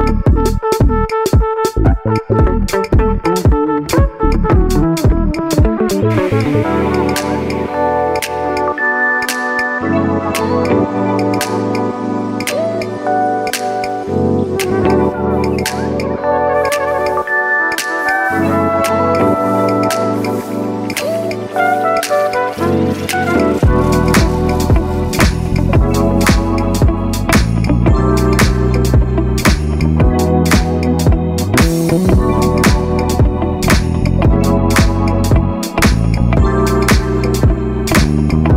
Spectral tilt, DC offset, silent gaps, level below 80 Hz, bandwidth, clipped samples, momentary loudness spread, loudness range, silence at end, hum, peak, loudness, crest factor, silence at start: -6 dB/octave; under 0.1%; none; -20 dBFS; 16.5 kHz; under 0.1%; 5 LU; 3 LU; 0 s; none; -2 dBFS; -14 LUFS; 12 dB; 0 s